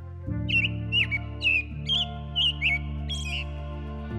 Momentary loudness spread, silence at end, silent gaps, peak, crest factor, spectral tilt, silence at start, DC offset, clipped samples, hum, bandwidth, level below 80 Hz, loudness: 11 LU; 0 s; none; -14 dBFS; 14 dB; -4 dB/octave; 0 s; under 0.1%; under 0.1%; none; 11.5 kHz; -38 dBFS; -26 LUFS